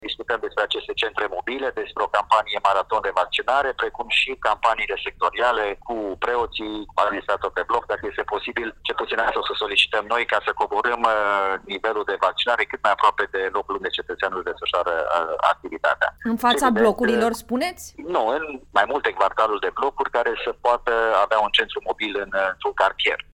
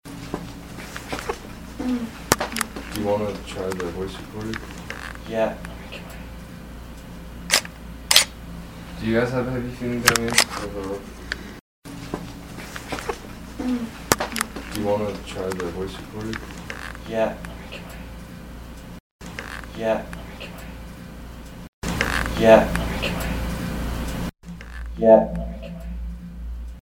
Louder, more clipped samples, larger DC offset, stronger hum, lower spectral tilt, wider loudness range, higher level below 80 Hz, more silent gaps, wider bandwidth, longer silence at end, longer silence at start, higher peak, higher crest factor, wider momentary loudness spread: about the same, -22 LUFS vs -24 LUFS; neither; neither; neither; about the same, -3 dB/octave vs -3.5 dB/octave; second, 3 LU vs 11 LU; second, -50 dBFS vs -38 dBFS; second, none vs 11.61-11.82 s, 19.00-19.19 s, 21.68-21.82 s; second, 16 kHz vs 18 kHz; about the same, 0.1 s vs 0 s; about the same, 0 s vs 0.05 s; about the same, -2 dBFS vs 0 dBFS; second, 20 dB vs 26 dB; second, 8 LU vs 21 LU